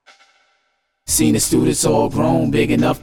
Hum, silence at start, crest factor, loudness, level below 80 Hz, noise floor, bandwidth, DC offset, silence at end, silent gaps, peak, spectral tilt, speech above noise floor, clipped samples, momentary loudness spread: none; 1.05 s; 14 dB; -16 LUFS; -38 dBFS; -67 dBFS; 19 kHz; under 0.1%; 0.05 s; none; -4 dBFS; -4.5 dB/octave; 52 dB; under 0.1%; 2 LU